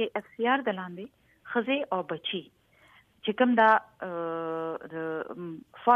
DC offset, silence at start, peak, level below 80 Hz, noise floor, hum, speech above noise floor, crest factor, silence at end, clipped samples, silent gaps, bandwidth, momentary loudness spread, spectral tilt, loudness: under 0.1%; 0 s; -8 dBFS; -74 dBFS; -60 dBFS; none; 32 dB; 22 dB; 0 s; under 0.1%; none; 5.6 kHz; 16 LU; -7 dB/octave; -29 LUFS